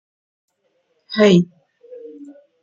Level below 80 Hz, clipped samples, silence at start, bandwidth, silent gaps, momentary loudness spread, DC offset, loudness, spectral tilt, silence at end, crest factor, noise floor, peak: -64 dBFS; under 0.1%; 1.1 s; 7.6 kHz; none; 25 LU; under 0.1%; -16 LUFS; -6.5 dB/octave; 0.4 s; 18 dB; -67 dBFS; -2 dBFS